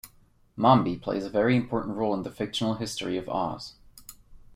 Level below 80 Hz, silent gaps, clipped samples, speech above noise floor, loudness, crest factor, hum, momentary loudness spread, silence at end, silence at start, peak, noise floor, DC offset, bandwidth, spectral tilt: -56 dBFS; none; under 0.1%; 34 dB; -27 LUFS; 22 dB; none; 22 LU; 0.15 s; 0.05 s; -6 dBFS; -60 dBFS; under 0.1%; 16 kHz; -6 dB/octave